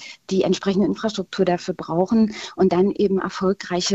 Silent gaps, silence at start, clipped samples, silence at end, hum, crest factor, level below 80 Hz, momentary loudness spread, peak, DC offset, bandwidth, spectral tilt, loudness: none; 0 s; under 0.1%; 0 s; none; 16 dB; -54 dBFS; 7 LU; -6 dBFS; under 0.1%; 8.2 kHz; -5.5 dB/octave; -21 LUFS